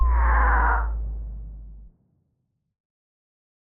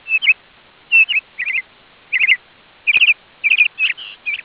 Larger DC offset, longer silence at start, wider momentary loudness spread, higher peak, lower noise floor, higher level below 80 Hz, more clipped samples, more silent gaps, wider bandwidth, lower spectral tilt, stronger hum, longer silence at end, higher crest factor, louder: neither; about the same, 0 s vs 0.05 s; first, 21 LU vs 10 LU; second, -10 dBFS vs -2 dBFS; first, -74 dBFS vs -48 dBFS; first, -26 dBFS vs -64 dBFS; neither; neither; second, 2.6 kHz vs 4 kHz; first, -7 dB/octave vs -1 dB/octave; neither; first, 1.85 s vs 0.05 s; about the same, 16 dB vs 16 dB; second, -23 LUFS vs -14 LUFS